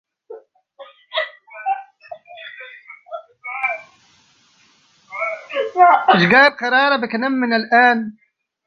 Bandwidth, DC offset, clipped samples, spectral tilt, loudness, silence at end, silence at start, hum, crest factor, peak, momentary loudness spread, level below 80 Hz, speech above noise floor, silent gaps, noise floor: 6.8 kHz; under 0.1%; under 0.1%; -6 dB/octave; -16 LUFS; 0.55 s; 0.3 s; none; 18 dB; 0 dBFS; 24 LU; -64 dBFS; 41 dB; none; -56 dBFS